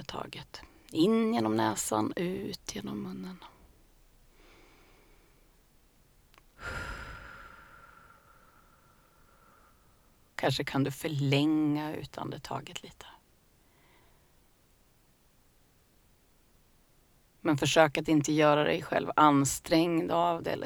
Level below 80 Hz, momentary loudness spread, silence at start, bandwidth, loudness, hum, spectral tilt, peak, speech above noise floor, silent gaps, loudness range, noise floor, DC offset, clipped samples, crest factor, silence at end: -58 dBFS; 21 LU; 0 s; over 20 kHz; -29 LUFS; none; -5 dB/octave; -6 dBFS; 37 dB; none; 21 LU; -65 dBFS; under 0.1%; under 0.1%; 26 dB; 0 s